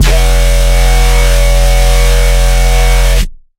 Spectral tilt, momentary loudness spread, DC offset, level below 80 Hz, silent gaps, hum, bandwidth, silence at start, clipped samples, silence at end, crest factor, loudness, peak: -3.5 dB/octave; 1 LU; under 0.1%; -8 dBFS; none; none; 16 kHz; 0 s; under 0.1%; 0.25 s; 6 dB; -10 LUFS; 0 dBFS